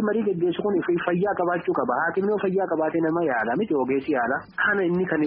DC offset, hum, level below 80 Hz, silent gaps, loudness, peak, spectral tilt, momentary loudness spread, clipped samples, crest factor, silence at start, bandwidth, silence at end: under 0.1%; none; -62 dBFS; none; -24 LUFS; -8 dBFS; -5.5 dB/octave; 1 LU; under 0.1%; 16 dB; 0 s; 5 kHz; 0 s